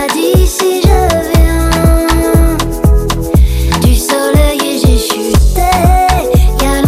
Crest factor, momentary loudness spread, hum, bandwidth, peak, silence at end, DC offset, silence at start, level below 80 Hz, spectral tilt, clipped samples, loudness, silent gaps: 8 dB; 2 LU; none; 16 kHz; 0 dBFS; 0 s; under 0.1%; 0 s; -12 dBFS; -5.5 dB/octave; under 0.1%; -10 LUFS; none